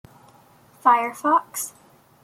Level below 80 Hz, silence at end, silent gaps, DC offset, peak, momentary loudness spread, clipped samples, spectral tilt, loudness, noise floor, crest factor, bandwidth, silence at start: -72 dBFS; 0.55 s; none; under 0.1%; -2 dBFS; 12 LU; under 0.1%; -2.5 dB/octave; -21 LUFS; -53 dBFS; 22 dB; 16.5 kHz; 0.85 s